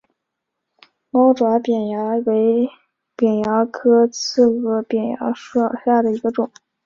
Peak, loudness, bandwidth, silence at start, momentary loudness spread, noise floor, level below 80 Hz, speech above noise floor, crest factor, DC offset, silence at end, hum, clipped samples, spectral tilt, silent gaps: -2 dBFS; -18 LUFS; 7.4 kHz; 1.15 s; 7 LU; -79 dBFS; -64 dBFS; 62 dB; 16 dB; under 0.1%; 0.4 s; none; under 0.1%; -5.5 dB/octave; none